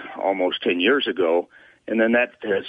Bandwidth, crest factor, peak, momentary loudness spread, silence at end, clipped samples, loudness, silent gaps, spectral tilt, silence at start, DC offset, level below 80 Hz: 5 kHz; 14 dB; -8 dBFS; 6 LU; 0 s; under 0.1%; -21 LUFS; none; -6.5 dB/octave; 0 s; under 0.1%; -66 dBFS